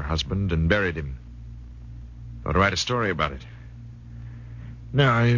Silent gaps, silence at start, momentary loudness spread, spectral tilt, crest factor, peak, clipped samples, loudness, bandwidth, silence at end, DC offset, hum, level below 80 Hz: none; 0 s; 21 LU; -5.5 dB/octave; 20 dB; -6 dBFS; under 0.1%; -24 LUFS; 7.4 kHz; 0 s; under 0.1%; none; -36 dBFS